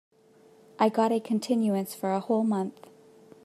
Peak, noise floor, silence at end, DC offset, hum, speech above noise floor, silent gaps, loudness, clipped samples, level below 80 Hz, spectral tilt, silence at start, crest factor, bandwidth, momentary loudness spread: -10 dBFS; -58 dBFS; 0.75 s; under 0.1%; none; 32 dB; none; -27 LUFS; under 0.1%; -82 dBFS; -6.5 dB/octave; 0.8 s; 18 dB; 14 kHz; 6 LU